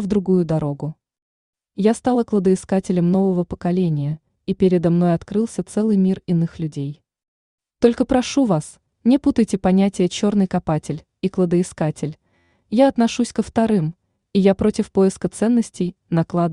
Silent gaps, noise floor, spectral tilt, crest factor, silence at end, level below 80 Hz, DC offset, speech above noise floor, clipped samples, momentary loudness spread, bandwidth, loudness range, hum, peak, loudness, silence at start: 1.22-1.53 s, 7.28-7.58 s; -62 dBFS; -7 dB/octave; 16 dB; 0 s; -48 dBFS; under 0.1%; 44 dB; under 0.1%; 10 LU; 11 kHz; 2 LU; none; -2 dBFS; -19 LUFS; 0 s